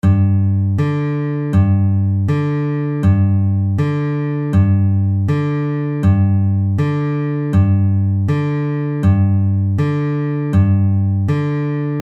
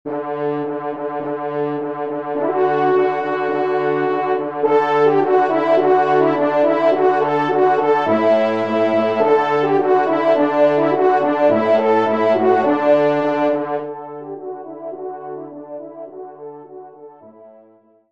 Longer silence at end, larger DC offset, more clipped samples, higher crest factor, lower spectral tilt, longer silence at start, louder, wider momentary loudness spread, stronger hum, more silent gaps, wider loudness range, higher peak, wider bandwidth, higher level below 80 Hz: second, 0 s vs 0.6 s; second, under 0.1% vs 0.3%; neither; about the same, 12 dB vs 14 dB; first, -10 dB/octave vs -7.5 dB/octave; about the same, 0.05 s vs 0.05 s; about the same, -16 LUFS vs -17 LUFS; second, 5 LU vs 16 LU; neither; neither; second, 0 LU vs 14 LU; about the same, -2 dBFS vs -2 dBFS; second, 4.1 kHz vs 7.2 kHz; first, -40 dBFS vs -68 dBFS